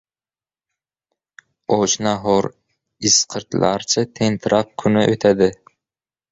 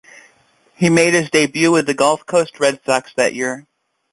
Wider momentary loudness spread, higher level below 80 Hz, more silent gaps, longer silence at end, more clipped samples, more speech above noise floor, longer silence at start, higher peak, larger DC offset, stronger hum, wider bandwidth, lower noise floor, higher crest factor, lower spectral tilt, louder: about the same, 7 LU vs 6 LU; first, -52 dBFS vs -58 dBFS; neither; first, 0.8 s vs 0.5 s; neither; first, over 73 dB vs 40 dB; first, 1.7 s vs 0.8 s; about the same, -2 dBFS vs -2 dBFS; neither; neither; second, 8 kHz vs 11.5 kHz; first, under -90 dBFS vs -56 dBFS; about the same, 18 dB vs 16 dB; about the same, -3.5 dB/octave vs -4 dB/octave; about the same, -18 LUFS vs -16 LUFS